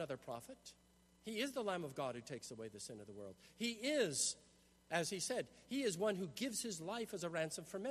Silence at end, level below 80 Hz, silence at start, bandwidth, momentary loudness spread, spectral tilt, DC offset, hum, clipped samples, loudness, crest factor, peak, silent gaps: 0 s; -78 dBFS; 0 s; 13.5 kHz; 15 LU; -3 dB/octave; under 0.1%; none; under 0.1%; -42 LUFS; 22 dB; -22 dBFS; none